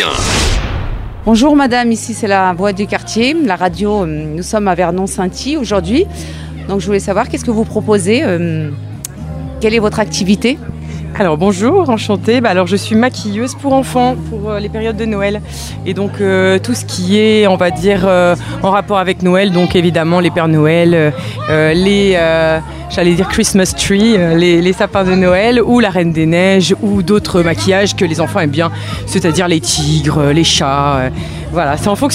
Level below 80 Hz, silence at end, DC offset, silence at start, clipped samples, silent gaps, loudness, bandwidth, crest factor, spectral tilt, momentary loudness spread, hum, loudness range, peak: -30 dBFS; 0 s; under 0.1%; 0 s; under 0.1%; none; -12 LUFS; 15.5 kHz; 12 dB; -5 dB/octave; 10 LU; none; 5 LU; 0 dBFS